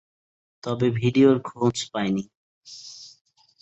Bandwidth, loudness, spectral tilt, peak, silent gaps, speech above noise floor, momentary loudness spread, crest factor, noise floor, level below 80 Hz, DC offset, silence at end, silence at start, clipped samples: 8.2 kHz; -23 LUFS; -6 dB/octave; -6 dBFS; 2.35-2.61 s; 22 dB; 23 LU; 18 dB; -44 dBFS; -60 dBFS; under 0.1%; 0.55 s; 0.65 s; under 0.1%